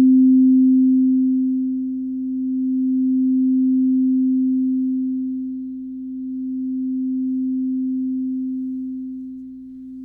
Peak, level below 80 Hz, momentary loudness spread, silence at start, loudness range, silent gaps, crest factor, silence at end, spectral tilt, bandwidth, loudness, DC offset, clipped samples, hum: -8 dBFS; -62 dBFS; 16 LU; 0 s; 7 LU; none; 10 dB; 0 s; -12.5 dB/octave; 0.5 kHz; -19 LUFS; under 0.1%; under 0.1%; 60 Hz at -60 dBFS